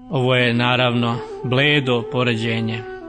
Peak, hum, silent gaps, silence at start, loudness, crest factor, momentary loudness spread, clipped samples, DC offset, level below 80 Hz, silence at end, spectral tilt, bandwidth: -2 dBFS; none; none; 0 s; -18 LUFS; 16 dB; 7 LU; under 0.1%; under 0.1%; -52 dBFS; 0 s; -6.5 dB/octave; 9.6 kHz